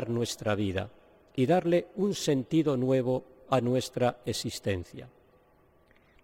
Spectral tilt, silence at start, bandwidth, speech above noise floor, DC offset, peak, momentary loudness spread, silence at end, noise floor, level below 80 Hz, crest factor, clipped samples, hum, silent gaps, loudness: -6 dB/octave; 0 s; 16.5 kHz; 34 dB; under 0.1%; -12 dBFS; 10 LU; 1.15 s; -63 dBFS; -62 dBFS; 18 dB; under 0.1%; none; none; -29 LUFS